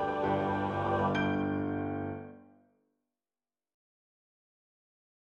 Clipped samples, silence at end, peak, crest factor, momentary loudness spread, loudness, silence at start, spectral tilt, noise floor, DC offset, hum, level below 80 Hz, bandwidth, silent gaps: under 0.1%; 2.95 s; -18 dBFS; 16 dB; 10 LU; -32 LUFS; 0 s; -8 dB/octave; under -90 dBFS; under 0.1%; none; -62 dBFS; 7.4 kHz; none